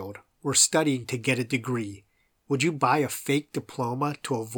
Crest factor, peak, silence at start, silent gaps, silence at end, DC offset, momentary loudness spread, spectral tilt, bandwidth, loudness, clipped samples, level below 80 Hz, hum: 20 dB; -6 dBFS; 0 s; none; 0 s; under 0.1%; 12 LU; -3.5 dB/octave; over 20 kHz; -26 LUFS; under 0.1%; -68 dBFS; none